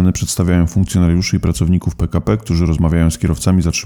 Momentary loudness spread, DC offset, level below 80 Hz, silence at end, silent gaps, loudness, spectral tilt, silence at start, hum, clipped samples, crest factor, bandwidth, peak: 3 LU; under 0.1%; -26 dBFS; 0 s; none; -15 LUFS; -6 dB/octave; 0 s; none; under 0.1%; 10 dB; 18 kHz; -4 dBFS